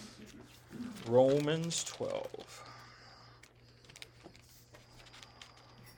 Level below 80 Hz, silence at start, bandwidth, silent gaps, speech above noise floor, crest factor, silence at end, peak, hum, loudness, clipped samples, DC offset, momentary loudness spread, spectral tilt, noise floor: -70 dBFS; 0 s; 19 kHz; none; 28 dB; 24 dB; 0.05 s; -14 dBFS; 60 Hz at -65 dBFS; -33 LUFS; under 0.1%; under 0.1%; 27 LU; -4.5 dB/octave; -60 dBFS